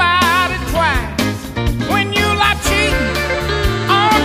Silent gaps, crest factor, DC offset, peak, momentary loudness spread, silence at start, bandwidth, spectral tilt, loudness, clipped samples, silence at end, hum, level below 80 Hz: none; 14 dB; under 0.1%; 0 dBFS; 7 LU; 0 s; 15.5 kHz; -4 dB/octave; -15 LUFS; under 0.1%; 0 s; none; -26 dBFS